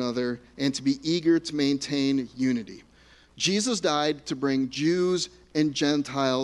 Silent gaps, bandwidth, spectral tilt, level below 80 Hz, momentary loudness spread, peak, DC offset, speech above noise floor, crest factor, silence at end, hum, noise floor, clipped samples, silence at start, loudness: none; 11.5 kHz; -4.5 dB/octave; -62 dBFS; 5 LU; -10 dBFS; under 0.1%; 30 dB; 16 dB; 0 s; none; -56 dBFS; under 0.1%; 0 s; -26 LUFS